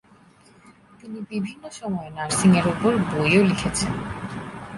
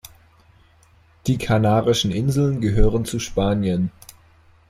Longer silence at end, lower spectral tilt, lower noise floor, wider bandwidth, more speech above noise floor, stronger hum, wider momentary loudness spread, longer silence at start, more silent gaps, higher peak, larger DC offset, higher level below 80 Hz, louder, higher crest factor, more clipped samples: second, 0 s vs 0.8 s; about the same, -5 dB/octave vs -6 dB/octave; about the same, -53 dBFS vs -54 dBFS; second, 11.5 kHz vs 15.5 kHz; second, 31 dB vs 36 dB; neither; first, 16 LU vs 7 LU; second, 1.05 s vs 1.25 s; neither; second, -6 dBFS vs -2 dBFS; neither; second, -48 dBFS vs -30 dBFS; about the same, -22 LUFS vs -21 LUFS; about the same, 18 dB vs 18 dB; neither